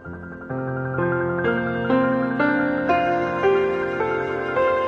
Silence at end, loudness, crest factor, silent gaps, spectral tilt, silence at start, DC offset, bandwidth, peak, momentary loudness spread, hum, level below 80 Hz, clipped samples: 0 s; -22 LUFS; 14 dB; none; -8 dB/octave; 0 s; under 0.1%; 7 kHz; -8 dBFS; 8 LU; none; -52 dBFS; under 0.1%